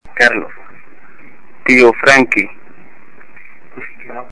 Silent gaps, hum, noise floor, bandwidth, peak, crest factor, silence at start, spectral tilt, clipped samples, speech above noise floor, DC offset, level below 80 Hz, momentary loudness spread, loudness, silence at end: none; none; -44 dBFS; 11 kHz; 0 dBFS; 16 dB; 0 s; -3.5 dB/octave; 0.3%; 34 dB; 4%; -52 dBFS; 24 LU; -10 LUFS; 0.1 s